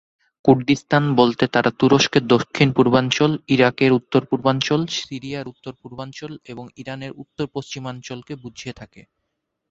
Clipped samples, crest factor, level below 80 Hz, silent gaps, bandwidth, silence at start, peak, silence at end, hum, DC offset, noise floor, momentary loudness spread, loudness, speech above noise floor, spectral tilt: under 0.1%; 20 dB; -56 dBFS; none; 7.8 kHz; 0.45 s; 0 dBFS; 0.7 s; none; under 0.1%; -77 dBFS; 19 LU; -18 LUFS; 57 dB; -5.5 dB/octave